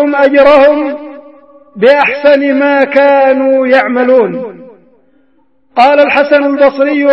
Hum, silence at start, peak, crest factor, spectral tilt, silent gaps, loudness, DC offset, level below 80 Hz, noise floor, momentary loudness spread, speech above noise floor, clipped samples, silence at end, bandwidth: none; 0 s; 0 dBFS; 8 dB; -6 dB/octave; none; -8 LUFS; 0.3%; -50 dBFS; -54 dBFS; 9 LU; 47 dB; 0.7%; 0 s; 5.8 kHz